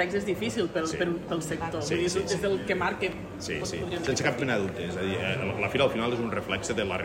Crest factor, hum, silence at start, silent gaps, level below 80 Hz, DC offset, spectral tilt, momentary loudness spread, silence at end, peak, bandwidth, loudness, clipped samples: 20 dB; none; 0 s; none; -52 dBFS; under 0.1%; -4.5 dB/octave; 6 LU; 0 s; -10 dBFS; 16 kHz; -29 LUFS; under 0.1%